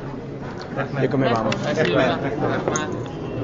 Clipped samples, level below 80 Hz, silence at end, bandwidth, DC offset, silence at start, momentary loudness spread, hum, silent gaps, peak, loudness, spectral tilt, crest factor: under 0.1%; -46 dBFS; 0 s; 7.8 kHz; under 0.1%; 0 s; 13 LU; none; none; -6 dBFS; -23 LUFS; -5.5 dB/octave; 16 dB